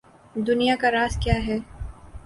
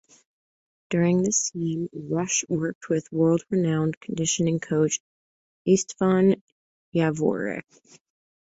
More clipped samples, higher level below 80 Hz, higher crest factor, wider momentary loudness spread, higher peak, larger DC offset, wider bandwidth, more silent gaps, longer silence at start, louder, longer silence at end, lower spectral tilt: neither; first, -36 dBFS vs -64 dBFS; about the same, 18 dB vs 18 dB; first, 19 LU vs 9 LU; about the same, -6 dBFS vs -8 dBFS; neither; first, 11.5 kHz vs 8.2 kHz; second, none vs 2.75-2.81 s, 3.97-4.01 s, 5.00-5.65 s, 6.41-6.92 s; second, 0.35 s vs 0.9 s; about the same, -23 LUFS vs -24 LUFS; second, 0.05 s vs 0.9 s; about the same, -5.5 dB/octave vs -5 dB/octave